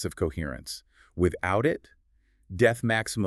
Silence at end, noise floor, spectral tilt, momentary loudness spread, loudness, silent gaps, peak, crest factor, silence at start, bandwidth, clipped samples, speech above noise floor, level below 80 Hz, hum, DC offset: 0 s; -65 dBFS; -5.5 dB/octave; 16 LU; -27 LUFS; none; -8 dBFS; 20 dB; 0 s; 13.5 kHz; under 0.1%; 38 dB; -46 dBFS; none; under 0.1%